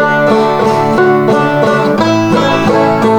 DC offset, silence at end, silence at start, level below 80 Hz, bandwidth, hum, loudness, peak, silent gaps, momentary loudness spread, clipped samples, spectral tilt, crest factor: under 0.1%; 0 s; 0 s; -44 dBFS; over 20 kHz; none; -10 LUFS; 0 dBFS; none; 1 LU; under 0.1%; -6 dB/octave; 10 dB